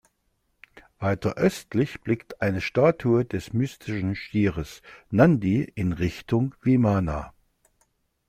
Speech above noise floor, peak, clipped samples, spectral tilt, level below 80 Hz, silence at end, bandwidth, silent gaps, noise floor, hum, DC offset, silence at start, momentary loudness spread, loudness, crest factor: 48 dB; -4 dBFS; under 0.1%; -7.5 dB/octave; -48 dBFS; 1 s; 15 kHz; none; -72 dBFS; none; under 0.1%; 1 s; 10 LU; -25 LUFS; 20 dB